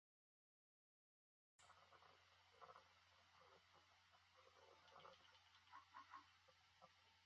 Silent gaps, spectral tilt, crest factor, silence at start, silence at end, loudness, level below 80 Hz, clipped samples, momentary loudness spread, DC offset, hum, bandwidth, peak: none; -0.5 dB/octave; 24 dB; 1.6 s; 0 s; -66 LUFS; under -90 dBFS; under 0.1%; 5 LU; under 0.1%; none; 7.4 kHz; -48 dBFS